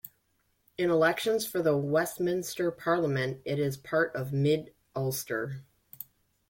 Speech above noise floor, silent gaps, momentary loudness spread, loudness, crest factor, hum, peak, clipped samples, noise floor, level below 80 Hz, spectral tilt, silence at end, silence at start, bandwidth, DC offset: 45 dB; none; 19 LU; -29 LUFS; 18 dB; none; -14 dBFS; under 0.1%; -73 dBFS; -68 dBFS; -5.5 dB/octave; 0.45 s; 0.05 s; 17 kHz; under 0.1%